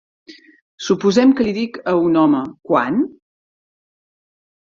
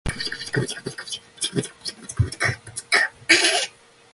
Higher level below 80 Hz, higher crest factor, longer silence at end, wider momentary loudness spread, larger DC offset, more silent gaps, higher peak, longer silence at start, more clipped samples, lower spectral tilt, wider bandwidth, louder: second, -58 dBFS vs -42 dBFS; second, 16 dB vs 24 dB; first, 1.6 s vs 0.45 s; second, 9 LU vs 16 LU; neither; first, 0.61-0.78 s vs none; about the same, -2 dBFS vs -2 dBFS; first, 0.3 s vs 0.05 s; neither; first, -6 dB/octave vs -2.5 dB/octave; second, 7.6 kHz vs 12 kHz; first, -17 LUFS vs -22 LUFS